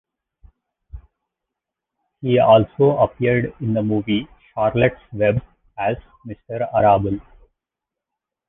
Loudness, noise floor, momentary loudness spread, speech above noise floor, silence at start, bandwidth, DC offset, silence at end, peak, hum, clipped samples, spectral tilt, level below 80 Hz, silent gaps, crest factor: -19 LUFS; -85 dBFS; 16 LU; 67 dB; 0.95 s; 3.9 kHz; under 0.1%; 1.25 s; -2 dBFS; none; under 0.1%; -10.5 dB/octave; -46 dBFS; none; 18 dB